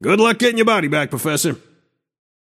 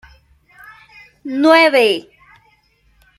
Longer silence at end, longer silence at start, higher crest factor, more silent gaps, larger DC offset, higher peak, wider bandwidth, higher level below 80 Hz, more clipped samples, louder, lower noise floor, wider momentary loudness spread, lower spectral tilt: second, 1 s vs 1.2 s; second, 0 s vs 1.25 s; about the same, 16 dB vs 16 dB; neither; neither; about the same, -2 dBFS vs -2 dBFS; about the same, 16 kHz vs 15 kHz; second, -64 dBFS vs -58 dBFS; neither; second, -17 LUFS vs -13 LUFS; first, -61 dBFS vs -57 dBFS; second, 7 LU vs 16 LU; about the same, -4 dB/octave vs -3.5 dB/octave